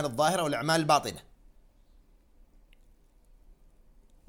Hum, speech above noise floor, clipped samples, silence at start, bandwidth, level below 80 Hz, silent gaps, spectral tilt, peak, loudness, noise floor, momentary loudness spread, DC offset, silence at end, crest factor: none; 32 dB; under 0.1%; 0 s; 17 kHz; -58 dBFS; none; -4 dB/octave; -8 dBFS; -27 LUFS; -60 dBFS; 14 LU; under 0.1%; 3.05 s; 24 dB